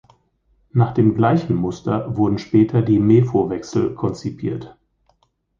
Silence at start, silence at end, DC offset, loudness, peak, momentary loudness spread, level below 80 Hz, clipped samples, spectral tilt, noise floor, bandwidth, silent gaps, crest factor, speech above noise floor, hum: 0.75 s; 0.9 s; under 0.1%; -19 LUFS; -2 dBFS; 11 LU; -48 dBFS; under 0.1%; -9 dB/octave; -63 dBFS; 7.4 kHz; none; 16 dB; 45 dB; none